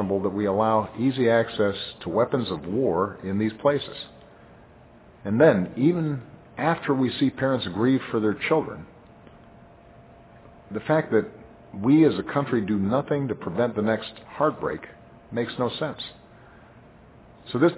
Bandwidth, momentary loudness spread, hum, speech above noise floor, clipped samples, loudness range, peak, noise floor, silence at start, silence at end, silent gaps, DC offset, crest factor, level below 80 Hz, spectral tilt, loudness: 4 kHz; 15 LU; none; 27 dB; under 0.1%; 5 LU; -4 dBFS; -51 dBFS; 0 s; 0 s; none; under 0.1%; 22 dB; -56 dBFS; -11 dB/octave; -24 LUFS